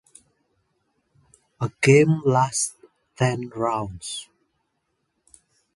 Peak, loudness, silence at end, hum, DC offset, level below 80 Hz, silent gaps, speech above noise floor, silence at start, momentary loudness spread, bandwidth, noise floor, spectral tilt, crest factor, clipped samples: -2 dBFS; -22 LUFS; 1.55 s; none; under 0.1%; -58 dBFS; none; 54 dB; 1.6 s; 15 LU; 11.5 kHz; -75 dBFS; -5 dB/octave; 22 dB; under 0.1%